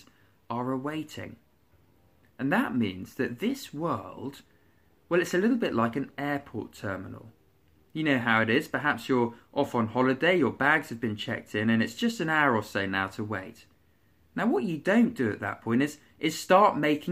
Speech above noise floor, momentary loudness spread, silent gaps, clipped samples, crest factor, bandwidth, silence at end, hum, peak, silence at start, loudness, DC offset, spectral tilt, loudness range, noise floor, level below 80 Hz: 38 dB; 13 LU; none; under 0.1%; 20 dB; 15.5 kHz; 0 s; none; -8 dBFS; 0.5 s; -28 LUFS; under 0.1%; -5.5 dB/octave; 6 LU; -65 dBFS; -66 dBFS